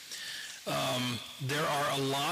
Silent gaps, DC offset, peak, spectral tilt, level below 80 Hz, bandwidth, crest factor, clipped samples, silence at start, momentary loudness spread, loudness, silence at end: none; under 0.1%; -24 dBFS; -3.5 dB/octave; -72 dBFS; 15.5 kHz; 10 dB; under 0.1%; 0 s; 9 LU; -33 LUFS; 0 s